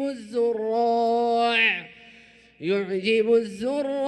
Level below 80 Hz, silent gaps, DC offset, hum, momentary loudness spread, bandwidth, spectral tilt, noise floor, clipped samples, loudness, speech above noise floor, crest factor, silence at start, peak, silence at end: -68 dBFS; none; under 0.1%; none; 8 LU; 10.5 kHz; -5 dB/octave; -52 dBFS; under 0.1%; -23 LUFS; 29 dB; 16 dB; 0 s; -8 dBFS; 0 s